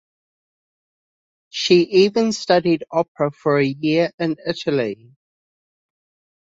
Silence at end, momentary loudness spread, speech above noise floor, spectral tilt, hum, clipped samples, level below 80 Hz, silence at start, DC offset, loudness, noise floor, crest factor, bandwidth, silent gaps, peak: 1.65 s; 9 LU; over 72 dB; -5.5 dB/octave; none; under 0.1%; -62 dBFS; 1.55 s; under 0.1%; -19 LUFS; under -90 dBFS; 18 dB; 7.8 kHz; 3.08-3.15 s, 4.14-4.18 s; -2 dBFS